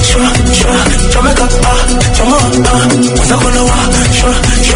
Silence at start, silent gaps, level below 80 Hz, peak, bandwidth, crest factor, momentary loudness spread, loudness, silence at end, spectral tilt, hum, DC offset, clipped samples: 0 s; none; -12 dBFS; 0 dBFS; 11 kHz; 8 dB; 1 LU; -9 LUFS; 0 s; -4 dB/octave; none; under 0.1%; 0.5%